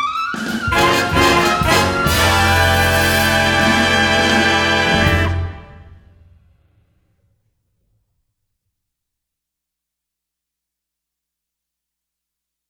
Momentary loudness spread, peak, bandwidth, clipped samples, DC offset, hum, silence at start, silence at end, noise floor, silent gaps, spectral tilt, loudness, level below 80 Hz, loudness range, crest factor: 7 LU; 0 dBFS; 20 kHz; under 0.1%; under 0.1%; 60 Hz at -55 dBFS; 0 s; 6.75 s; -82 dBFS; none; -4 dB/octave; -14 LUFS; -34 dBFS; 8 LU; 18 dB